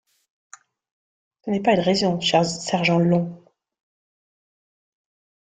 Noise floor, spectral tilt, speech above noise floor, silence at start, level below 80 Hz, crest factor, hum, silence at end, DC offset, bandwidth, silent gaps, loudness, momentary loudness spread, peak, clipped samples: under -90 dBFS; -5 dB/octave; over 70 dB; 1.45 s; -62 dBFS; 20 dB; none; 2.15 s; under 0.1%; 9.2 kHz; none; -20 LUFS; 8 LU; -4 dBFS; under 0.1%